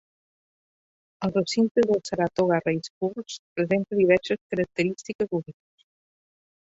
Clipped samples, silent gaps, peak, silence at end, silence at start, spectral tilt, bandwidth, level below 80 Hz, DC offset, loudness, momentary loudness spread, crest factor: under 0.1%; 1.71-1.75 s, 2.90-3.01 s, 3.39-3.56 s, 4.41-4.50 s, 5.15-5.19 s; -8 dBFS; 1.15 s; 1.2 s; -6 dB/octave; 8 kHz; -62 dBFS; under 0.1%; -25 LUFS; 10 LU; 18 dB